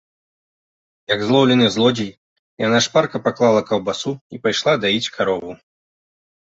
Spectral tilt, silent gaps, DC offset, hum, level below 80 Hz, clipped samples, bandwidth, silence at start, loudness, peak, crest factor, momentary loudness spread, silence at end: -4.5 dB/octave; 2.17-2.57 s, 4.21-4.30 s; under 0.1%; none; -58 dBFS; under 0.1%; 8 kHz; 1.1 s; -18 LUFS; -2 dBFS; 18 dB; 11 LU; 0.95 s